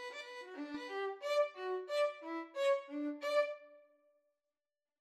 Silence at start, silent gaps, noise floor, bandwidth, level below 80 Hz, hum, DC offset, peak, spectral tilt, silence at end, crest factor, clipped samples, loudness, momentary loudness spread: 0 s; none; under -90 dBFS; 13 kHz; under -90 dBFS; none; under 0.1%; -22 dBFS; -2 dB/octave; 1.2 s; 18 dB; under 0.1%; -38 LUFS; 11 LU